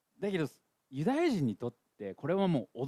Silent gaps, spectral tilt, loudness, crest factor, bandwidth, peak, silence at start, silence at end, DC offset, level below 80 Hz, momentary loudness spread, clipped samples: none; -7.5 dB/octave; -33 LUFS; 14 dB; 13.5 kHz; -18 dBFS; 0.2 s; 0 s; under 0.1%; -72 dBFS; 14 LU; under 0.1%